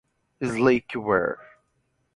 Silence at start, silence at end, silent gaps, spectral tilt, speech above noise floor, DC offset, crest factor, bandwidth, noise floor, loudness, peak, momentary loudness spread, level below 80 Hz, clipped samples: 0.4 s; 0.75 s; none; -6.5 dB/octave; 48 dB; under 0.1%; 20 dB; 11 kHz; -71 dBFS; -24 LUFS; -6 dBFS; 11 LU; -56 dBFS; under 0.1%